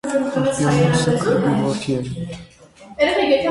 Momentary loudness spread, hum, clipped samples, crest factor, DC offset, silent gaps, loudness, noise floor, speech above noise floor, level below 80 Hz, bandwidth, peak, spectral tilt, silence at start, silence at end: 14 LU; none; under 0.1%; 16 dB; under 0.1%; none; -19 LUFS; -43 dBFS; 26 dB; -46 dBFS; 11.5 kHz; -4 dBFS; -5.5 dB/octave; 0.05 s; 0 s